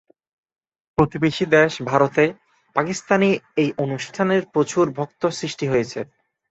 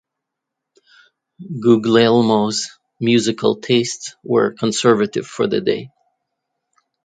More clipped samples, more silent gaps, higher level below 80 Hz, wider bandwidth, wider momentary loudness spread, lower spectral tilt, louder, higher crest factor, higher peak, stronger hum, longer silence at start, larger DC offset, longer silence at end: neither; neither; first, -54 dBFS vs -62 dBFS; second, 8.2 kHz vs 9.4 kHz; about the same, 9 LU vs 11 LU; about the same, -5.5 dB/octave vs -5 dB/octave; second, -21 LUFS vs -17 LUFS; about the same, 20 dB vs 18 dB; about the same, -2 dBFS vs 0 dBFS; neither; second, 1 s vs 1.4 s; neither; second, 0.45 s vs 1.15 s